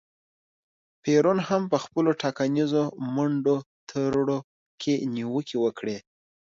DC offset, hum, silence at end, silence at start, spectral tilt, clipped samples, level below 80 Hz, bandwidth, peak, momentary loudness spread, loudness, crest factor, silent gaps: under 0.1%; none; 0.5 s; 1.05 s; -6.5 dB/octave; under 0.1%; -66 dBFS; 7.6 kHz; -8 dBFS; 10 LU; -26 LUFS; 18 dB; 3.66-3.87 s, 4.44-4.78 s